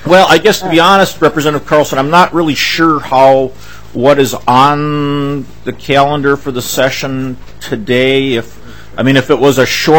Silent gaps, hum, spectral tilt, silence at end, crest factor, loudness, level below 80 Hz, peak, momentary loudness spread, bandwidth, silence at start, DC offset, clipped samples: none; none; -4.5 dB/octave; 0 s; 10 dB; -10 LUFS; -38 dBFS; 0 dBFS; 13 LU; 18.5 kHz; 0.05 s; 4%; 2%